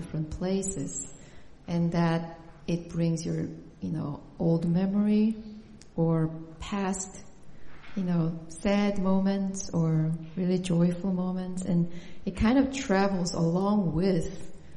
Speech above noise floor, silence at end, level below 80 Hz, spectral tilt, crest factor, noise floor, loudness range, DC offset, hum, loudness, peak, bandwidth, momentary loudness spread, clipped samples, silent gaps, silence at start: 20 dB; 0 s; -48 dBFS; -6.5 dB/octave; 16 dB; -48 dBFS; 4 LU; under 0.1%; none; -29 LUFS; -12 dBFS; 11 kHz; 14 LU; under 0.1%; none; 0 s